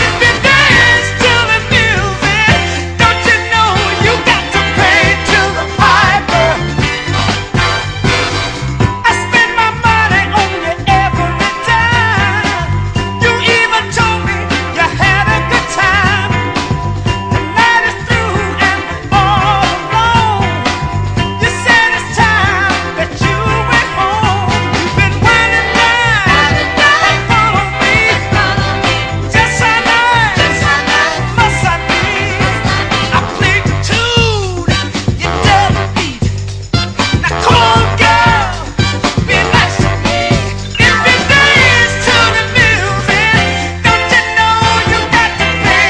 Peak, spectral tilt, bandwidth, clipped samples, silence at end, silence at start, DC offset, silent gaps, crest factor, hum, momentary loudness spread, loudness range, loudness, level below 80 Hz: 0 dBFS; -4 dB/octave; 11 kHz; 0.4%; 0 s; 0 s; under 0.1%; none; 10 dB; none; 7 LU; 3 LU; -10 LUFS; -26 dBFS